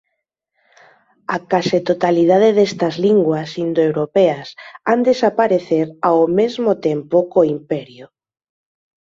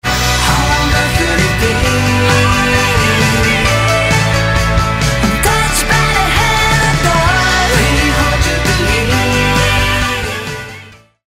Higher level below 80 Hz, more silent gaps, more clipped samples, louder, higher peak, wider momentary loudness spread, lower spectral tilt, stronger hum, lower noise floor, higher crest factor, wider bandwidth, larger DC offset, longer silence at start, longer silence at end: second, -62 dBFS vs -20 dBFS; neither; neither; second, -16 LUFS vs -11 LUFS; about the same, -2 dBFS vs 0 dBFS; first, 11 LU vs 3 LU; first, -6.5 dB/octave vs -4 dB/octave; neither; first, -75 dBFS vs -36 dBFS; about the same, 16 dB vs 12 dB; second, 7.6 kHz vs 16 kHz; neither; first, 1.3 s vs 0.05 s; first, 1.05 s vs 0.35 s